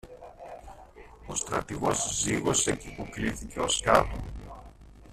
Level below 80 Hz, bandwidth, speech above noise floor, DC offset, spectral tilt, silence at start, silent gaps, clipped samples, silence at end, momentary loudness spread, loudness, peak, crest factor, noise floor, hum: -46 dBFS; 15 kHz; 21 dB; under 0.1%; -3 dB/octave; 0.05 s; none; under 0.1%; 0 s; 23 LU; -28 LUFS; -6 dBFS; 26 dB; -50 dBFS; none